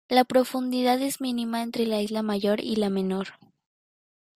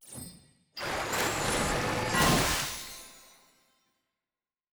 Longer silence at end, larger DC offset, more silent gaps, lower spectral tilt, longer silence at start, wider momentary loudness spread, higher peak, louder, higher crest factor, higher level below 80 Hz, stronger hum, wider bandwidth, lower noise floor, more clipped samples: second, 1 s vs 1.5 s; neither; neither; first, -5 dB/octave vs -3 dB/octave; about the same, 0.1 s vs 0.05 s; second, 6 LU vs 21 LU; first, -6 dBFS vs -12 dBFS; first, -26 LUFS vs -29 LUFS; about the same, 20 dB vs 20 dB; second, -66 dBFS vs -46 dBFS; neither; second, 16 kHz vs over 20 kHz; about the same, under -90 dBFS vs under -90 dBFS; neither